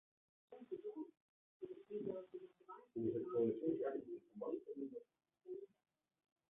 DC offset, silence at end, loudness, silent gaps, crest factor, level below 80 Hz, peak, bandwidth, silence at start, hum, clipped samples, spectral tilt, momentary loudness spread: under 0.1%; 0.85 s; -46 LUFS; 1.22-1.60 s; 20 dB; -86 dBFS; -28 dBFS; 3.8 kHz; 0.5 s; none; under 0.1%; -7 dB/octave; 19 LU